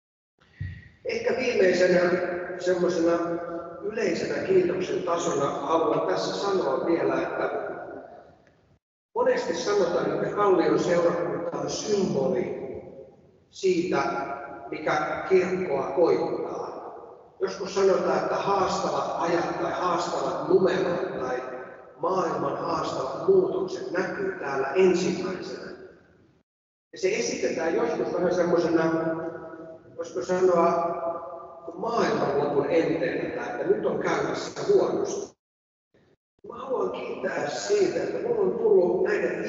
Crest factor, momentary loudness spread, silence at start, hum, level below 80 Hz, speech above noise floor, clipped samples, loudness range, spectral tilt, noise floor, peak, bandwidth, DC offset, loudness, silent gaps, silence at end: 18 dB; 14 LU; 0.6 s; none; -62 dBFS; 35 dB; under 0.1%; 4 LU; -5.5 dB/octave; -59 dBFS; -10 dBFS; 7.8 kHz; under 0.1%; -26 LUFS; 8.82-9.09 s, 26.43-26.91 s, 35.39-35.91 s, 36.17-36.38 s; 0 s